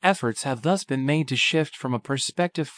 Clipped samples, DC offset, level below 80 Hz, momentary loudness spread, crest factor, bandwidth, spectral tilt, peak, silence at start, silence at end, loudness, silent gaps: under 0.1%; under 0.1%; -74 dBFS; 6 LU; 20 dB; 10.5 kHz; -4.5 dB/octave; -4 dBFS; 0 s; 0.05 s; -24 LUFS; none